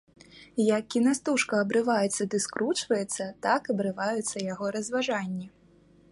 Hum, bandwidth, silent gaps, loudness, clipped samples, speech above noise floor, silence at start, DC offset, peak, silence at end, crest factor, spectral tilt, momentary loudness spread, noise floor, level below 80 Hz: none; 11.5 kHz; none; -28 LUFS; under 0.1%; 31 dB; 0.35 s; under 0.1%; -12 dBFS; 0.65 s; 16 dB; -4 dB/octave; 7 LU; -59 dBFS; -70 dBFS